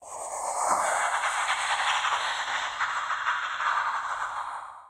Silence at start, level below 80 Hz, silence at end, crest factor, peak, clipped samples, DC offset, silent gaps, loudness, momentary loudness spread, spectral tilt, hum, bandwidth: 0 s; -68 dBFS; 0 s; 16 dB; -12 dBFS; under 0.1%; under 0.1%; none; -28 LUFS; 7 LU; 1.5 dB/octave; none; 16 kHz